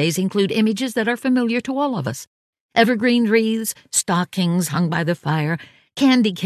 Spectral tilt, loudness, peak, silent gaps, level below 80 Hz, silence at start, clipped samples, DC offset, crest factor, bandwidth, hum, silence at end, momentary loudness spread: -4.5 dB/octave; -19 LUFS; -2 dBFS; 2.27-2.53 s, 2.61-2.69 s; -62 dBFS; 0 s; under 0.1%; under 0.1%; 18 dB; 14.5 kHz; none; 0 s; 8 LU